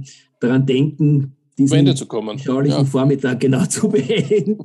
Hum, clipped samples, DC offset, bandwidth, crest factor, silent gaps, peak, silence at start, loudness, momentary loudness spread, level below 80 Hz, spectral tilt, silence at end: none; under 0.1%; under 0.1%; 12 kHz; 14 dB; none; -2 dBFS; 0 s; -17 LUFS; 7 LU; -66 dBFS; -6.5 dB/octave; 0 s